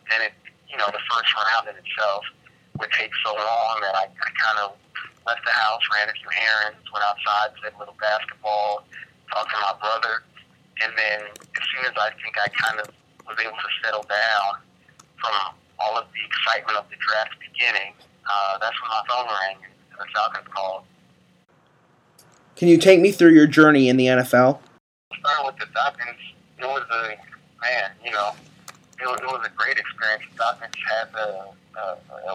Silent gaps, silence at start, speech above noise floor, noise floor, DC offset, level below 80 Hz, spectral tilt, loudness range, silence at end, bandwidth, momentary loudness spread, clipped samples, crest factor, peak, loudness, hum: 24.80-25.11 s; 0.05 s; 37 dB; -59 dBFS; under 0.1%; -74 dBFS; -4.5 dB/octave; 10 LU; 0 s; 15.5 kHz; 16 LU; under 0.1%; 22 dB; 0 dBFS; -22 LUFS; none